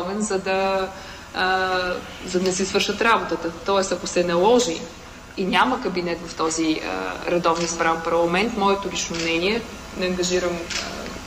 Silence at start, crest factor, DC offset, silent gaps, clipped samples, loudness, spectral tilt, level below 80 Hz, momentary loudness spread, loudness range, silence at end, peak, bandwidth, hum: 0 s; 18 dB; under 0.1%; none; under 0.1%; -22 LUFS; -3.5 dB/octave; -46 dBFS; 9 LU; 2 LU; 0 s; -6 dBFS; 15.5 kHz; none